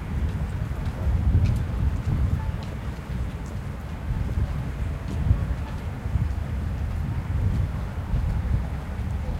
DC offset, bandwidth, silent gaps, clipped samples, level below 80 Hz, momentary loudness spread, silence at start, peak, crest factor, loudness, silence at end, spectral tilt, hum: under 0.1%; 13 kHz; none; under 0.1%; -28 dBFS; 7 LU; 0 s; -8 dBFS; 18 dB; -28 LUFS; 0 s; -8 dB/octave; none